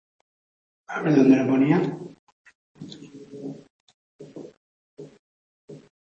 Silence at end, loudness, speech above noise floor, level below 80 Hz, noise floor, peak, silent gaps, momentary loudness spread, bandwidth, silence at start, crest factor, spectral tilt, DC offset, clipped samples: 0.3 s; -20 LUFS; 23 dB; -70 dBFS; -43 dBFS; -6 dBFS; 2.19-2.44 s, 2.55-2.75 s, 3.70-3.88 s, 3.94-4.19 s, 4.57-4.97 s, 5.19-5.68 s; 26 LU; 7.2 kHz; 0.9 s; 20 dB; -8 dB/octave; under 0.1%; under 0.1%